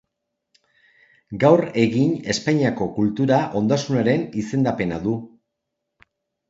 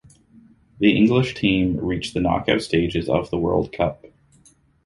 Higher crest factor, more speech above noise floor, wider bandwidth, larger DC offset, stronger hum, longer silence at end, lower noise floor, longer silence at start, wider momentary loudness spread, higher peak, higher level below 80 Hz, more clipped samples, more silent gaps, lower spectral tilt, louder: about the same, 20 dB vs 18 dB; first, 60 dB vs 36 dB; second, 8 kHz vs 11.5 kHz; neither; neither; first, 1.2 s vs 0.9 s; first, -80 dBFS vs -56 dBFS; first, 1.3 s vs 0.8 s; about the same, 8 LU vs 7 LU; about the same, -2 dBFS vs -2 dBFS; second, -54 dBFS vs -42 dBFS; neither; neither; about the same, -6.5 dB/octave vs -6.5 dB/octave; about the same, -20 LUFS vs -21 LUFS